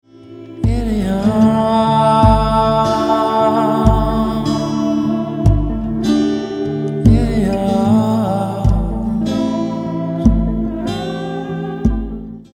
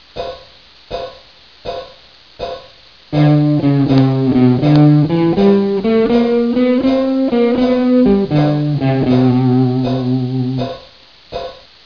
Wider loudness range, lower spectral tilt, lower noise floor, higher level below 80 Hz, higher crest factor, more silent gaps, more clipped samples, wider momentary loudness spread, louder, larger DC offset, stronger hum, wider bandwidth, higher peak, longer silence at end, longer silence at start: about the same, 5 LU vs 6 LU; second, -8 dB/octave vs -9.5 dB/octave; second, -36 dBFS vs -43 dBFS; first, -24 dBFS vs -42 dBFS; about the same, 14 dB vs 14 dB; neither; neither; second, 9 LU vs 16 LU; second, -16 LUFS vs -13 LUFS; second, under 0.1% vs 0.3%; neither; first, 14.5 kHz vs 5.4 kHz; about the same, 0 dBFS vs 0 dBFS; second, 0.1 s vs 0.3 s; about the same, 0.2 s vs 0.15 s